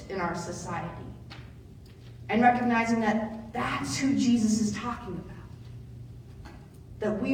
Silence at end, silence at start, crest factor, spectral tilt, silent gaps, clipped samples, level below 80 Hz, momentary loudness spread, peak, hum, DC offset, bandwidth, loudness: 0 s; 0 s; 20 dB; -5 dB/octave; none; under 0.1%; -52 dBFS; 23 LU; -10 dBFS; none; under 0.1%; 14 kHz; -28 LUFS